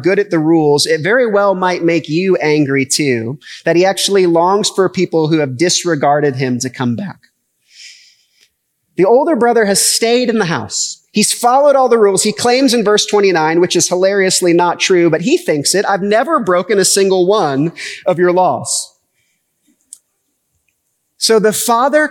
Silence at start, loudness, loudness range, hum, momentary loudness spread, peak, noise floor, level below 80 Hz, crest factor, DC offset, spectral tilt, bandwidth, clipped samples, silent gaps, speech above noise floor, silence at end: 0 s; -12 LUFS; 7 LU; none; 7 LU; 0 dBFS; -66 dBFS; -68 dBFS; 12 dB; under 0.1%; -3.5 dB/octave; 18 kHz; under 0.1%; none; 54 dB; 0 s